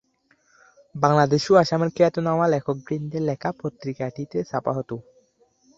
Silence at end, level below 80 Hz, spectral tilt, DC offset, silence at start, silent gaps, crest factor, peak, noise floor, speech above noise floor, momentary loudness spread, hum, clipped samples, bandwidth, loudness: 0.75 s; -60 dBFS; -6.5 dB/octave; under 0.1%; 0.95 s; none; 22 dB; -2 dBFS; -64 dBFS; 42 dB; 13 LU; none; under 0.1%; 8 kHz; -23 LUFS